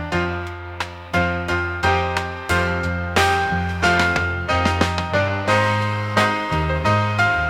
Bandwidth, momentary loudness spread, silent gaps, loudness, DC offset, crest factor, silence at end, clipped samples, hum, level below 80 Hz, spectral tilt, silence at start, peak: 16 kHz; 6 LU; none; -20 LUFS; 0.1%; 18 dB; 0 s; under 0.1%; none; -40 dBFS; -5 dB/octave; 0 s; -2 dBFS